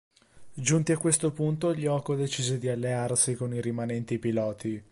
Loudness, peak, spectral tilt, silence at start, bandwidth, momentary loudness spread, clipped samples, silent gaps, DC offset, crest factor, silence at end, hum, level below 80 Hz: -28 LUFS; -8 dBFS; -5 dB/octave; 0.35 s; 11.5 kHz; 6 LU; under 0.1%; none; under 0.1%; 20 dB; 0.1 s; none; -64 dBFS